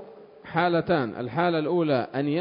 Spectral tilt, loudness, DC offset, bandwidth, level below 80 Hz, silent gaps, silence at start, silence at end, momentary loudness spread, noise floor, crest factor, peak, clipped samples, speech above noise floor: -11 dB/octave; -25 LUFS; under 0.1%; 5.4 kHz; -62 dBFS; none; 0 s; 0 s; 4 LU; -45 dBFS; 18 dB; -8 dBFS; under 0.1%; 21 dB